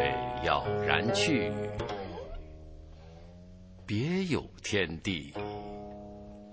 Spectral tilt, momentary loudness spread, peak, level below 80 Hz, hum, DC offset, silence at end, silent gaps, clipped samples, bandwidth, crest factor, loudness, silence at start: -5 dB/octave; 24 LU; -8 dBFS; -50 dBFS; none; under 0.1%; 0 s; none; under 0.1%; 8 kHz; 24 dB; -31 LUFS; 0 s